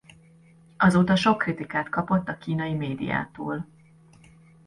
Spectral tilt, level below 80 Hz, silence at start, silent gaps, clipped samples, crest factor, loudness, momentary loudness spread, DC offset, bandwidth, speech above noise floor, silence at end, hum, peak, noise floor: -6.5 dB/octave; -56 dBFS; 0.8 s; none; under 0.1%; 18 dB; -25 LUFS; 13 LU; under 0.1%; 11.5 kHz; 30 dB; 1 s; none; -8 dBFS; -54 dBFS